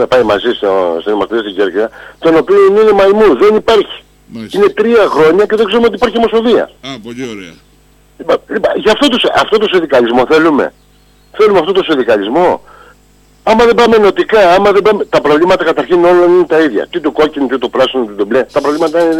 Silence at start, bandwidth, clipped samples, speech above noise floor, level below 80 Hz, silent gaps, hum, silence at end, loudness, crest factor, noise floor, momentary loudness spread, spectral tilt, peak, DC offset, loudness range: 0 s; 13.5 kHz; under 0.1%; 36 dB; -42 dBFS; none; 50 Hz at -50 dBFS; 0 s; -10 LUFS; 8 dB; -46 dBFS; 11 LU; -5 dB/octave; -2 dBFS; under 0.1%; 4 LU